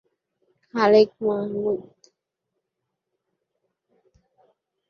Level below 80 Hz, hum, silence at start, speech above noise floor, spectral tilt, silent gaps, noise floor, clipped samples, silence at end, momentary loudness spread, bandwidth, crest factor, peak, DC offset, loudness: -70 dBFS; none; 0.75 s; 61 dB; -6.5 dB/octave; none; -82 dBFS; under 0.1%; 3.1 s; 13 LU; 6.8 kHz; 22 dB; -6 dBFS; under 0.1%; -21 LUFS